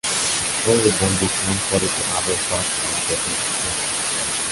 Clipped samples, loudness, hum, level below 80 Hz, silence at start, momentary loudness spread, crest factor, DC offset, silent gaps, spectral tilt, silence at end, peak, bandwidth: under 0.1%; -18 LUFS; none; -42 dBFS; 0.05 s; 4 LU; 18 dB; under 0.1%; none; -2 dB/octave; 0 s; -2 dBFS; 12 kHz